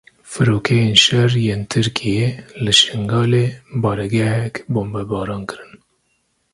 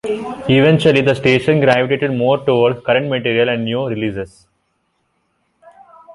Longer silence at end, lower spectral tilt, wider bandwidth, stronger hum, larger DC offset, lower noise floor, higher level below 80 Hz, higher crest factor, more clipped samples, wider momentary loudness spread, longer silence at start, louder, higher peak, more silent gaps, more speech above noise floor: first, 0.8 s vs 0 s; second, -4.5 dB/octave vs -7 dB/octave; about the same, 11.5 kHz vs 11.5 kHz; neither; neither; about the same, -66 dBFS vs -66 dBFS; about the same, -46 dBFS vs -50 dBFS; about the same, 18 dB vs 14 dB; neither; about the same, 12 LU vs 10 LU; first, 0.25 s vs 0.05 s; about the same, -17 LUFS vs -15 LUFS; about the same, 0 dBFS vs -2 dBFS; neither; about the same, 49 dB vs 51 dB